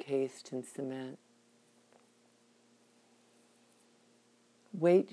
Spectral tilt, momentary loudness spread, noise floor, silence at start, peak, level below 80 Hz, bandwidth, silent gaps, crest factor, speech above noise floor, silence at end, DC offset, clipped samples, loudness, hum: -7 dB/octave; 20 LU; -68 dBFS; 0 s; -16 dBFS; under -90 dBFS; 11 kHz; none; 22 dB; 36 dB; 0.05 s; under 0.1%; under 0.1%; -35 LUFS; none